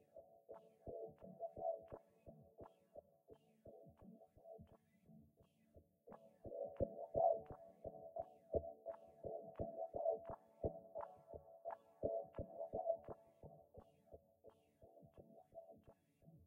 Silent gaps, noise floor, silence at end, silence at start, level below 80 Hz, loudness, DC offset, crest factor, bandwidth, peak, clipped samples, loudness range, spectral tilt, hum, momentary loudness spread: none; -75 dBFS; 0 s; 0.15 s; -68 dBFS; -48 LUFS; under 0.1%; 24 dB; 3.4 kHz; -26 dBFS; under 0.1%; 18 LU; -10 dB/octave; none; 23 LU